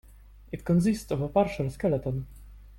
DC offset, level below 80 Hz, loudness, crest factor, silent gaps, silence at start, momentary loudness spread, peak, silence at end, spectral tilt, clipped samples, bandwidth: under 0.1%; -48 dBFS; -28 LUFS; 18 dB; none; 0.5 s; 13 LU; -10 dBFS; 0 s; -7.5 dB/octave; under 0.1%; 16.5 kHz